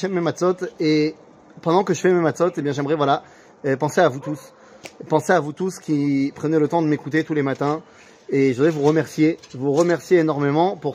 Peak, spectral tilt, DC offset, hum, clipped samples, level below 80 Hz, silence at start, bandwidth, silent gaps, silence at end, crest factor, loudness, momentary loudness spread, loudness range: -2 dBFS; -6.5 dB/octave; under 0.1%; none; under 0.1%; -66 dBFS; 0 s; 15.5 kHz; none; 0 s; 18 dB; -20 LUFS; 8 LU; 2 LU